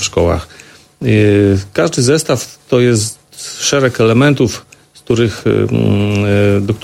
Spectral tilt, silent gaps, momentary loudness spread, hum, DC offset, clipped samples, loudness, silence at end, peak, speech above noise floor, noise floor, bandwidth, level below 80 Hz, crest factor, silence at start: -5.5 dB/octave; none; 11 LU; none; under 0.1%; under 0.1%; -13 LUFS; 0 s; 0 dBFS; 24 dB; -36 dBFS; 15.5 kHz; -38 dBFS; 12 dB; 0 s